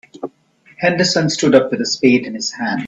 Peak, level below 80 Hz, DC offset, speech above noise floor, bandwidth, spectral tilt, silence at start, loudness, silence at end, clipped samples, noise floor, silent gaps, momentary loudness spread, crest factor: 0 dBFS; -58 dBFS; under 0.1%; 36 dB; 8.2 kHz; -4 dB/octave; 0.15 s; -15 LUFS; 0 s; under 0.1%; -51 dBFS; none; 17 LU; 16 dB